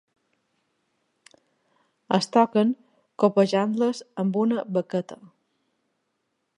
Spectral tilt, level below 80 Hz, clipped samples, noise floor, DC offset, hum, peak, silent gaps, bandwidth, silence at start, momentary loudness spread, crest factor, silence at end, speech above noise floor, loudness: -6.5 dB/octave; -80 dBFS; under 0.1%; -76 dBFS; under 0.1%; none; -6 dBFS; none; 11 kHz; 2.1 s; 10 LU; 20 dB; 1.4 s; 54 dB; -24 LUFS